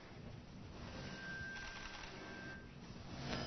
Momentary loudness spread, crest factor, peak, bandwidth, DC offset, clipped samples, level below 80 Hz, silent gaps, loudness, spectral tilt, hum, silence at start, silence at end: 8 LU; 26 dB; -24 dBFS; 6.2 kHz; under 0.1%; under 0.1%; -60 dBFS; none; -50 LUFS; -3.5 dB/octave; none; 0 s; 0 s